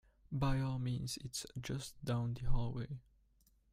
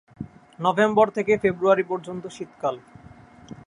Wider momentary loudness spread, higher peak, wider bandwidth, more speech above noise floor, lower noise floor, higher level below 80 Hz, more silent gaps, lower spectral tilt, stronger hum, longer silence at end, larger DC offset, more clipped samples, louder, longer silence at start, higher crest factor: second, 9 LU vs 21 LU; second, -20 dBFS vs -4 dBFS; first, 15.5 kHz vs 10.5 kHz; first, 35 dB vs 25 dB; first, -72 dBFS vs -48 dBFS; first, -46 dBFS vs -58 dBFS; neither; about the same, -5.5 dB/octave vs -6 dB/octave; neither; first, 0.75 s vs 0.1 s; neither; neither; second, -40 LUFS vs -22 LUFS; about the same, 0.3 s vs 0.2 s; about the same, 18 dB vs 20 dB